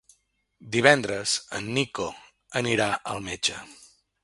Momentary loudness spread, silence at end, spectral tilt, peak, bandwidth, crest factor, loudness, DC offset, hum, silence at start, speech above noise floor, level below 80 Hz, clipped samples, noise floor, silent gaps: 13 LU; 0.4 s; -3 dB/octave; 0 dBFS; 11.5 kHz; 26 dB; -25 LUFS; under 0.1%; none; 0.6 s; 42 dB; -60 dBFS; under 0.1%; -68 dBFS; none